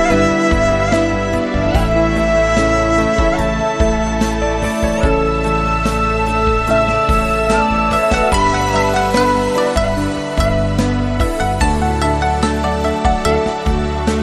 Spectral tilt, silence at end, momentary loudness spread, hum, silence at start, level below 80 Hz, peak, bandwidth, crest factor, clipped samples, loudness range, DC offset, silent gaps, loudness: -5.5 dB/octave; 0 s; 4 LU; none; 0 s; -22 dBFS; -2 dBFS; 13.5 kHz; 14 dB; under 0.1%; 2 LU; under 0.1%; none; -15 LUFS